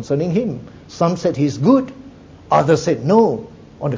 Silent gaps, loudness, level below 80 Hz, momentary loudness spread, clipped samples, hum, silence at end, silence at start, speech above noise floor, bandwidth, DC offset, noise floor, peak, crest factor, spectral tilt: none; -17 LUFS; -50 dBFS; 13 LU; under 0.1%; none; 0 s; 0 s; 23 dB; 7.8 kHz; under 0.1%; -40 dBFS; -2 dBFS; 16 dB; -7 dB/octave